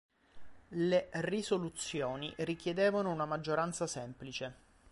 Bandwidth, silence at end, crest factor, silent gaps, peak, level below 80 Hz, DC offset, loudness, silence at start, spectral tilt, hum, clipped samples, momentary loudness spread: 11.5 kHz; 0.4 s; 18 dB; none; -18 dBFS; -66 dBFS; under 0.1%; -36 LUFS; 0.35 s; -5 dB/octave; none; under 0.1%; 11 LU